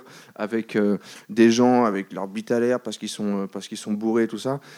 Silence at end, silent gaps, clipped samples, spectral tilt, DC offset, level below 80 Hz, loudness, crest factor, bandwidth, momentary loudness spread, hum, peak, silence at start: 0 s; none; under 0.1%; -5.5 dB/octave; under 0.1%; -76 dBFS; -23 LUFS; 18 dB; 13.5 kHz; 13 LU; none; -4 dBFS; 0.1 s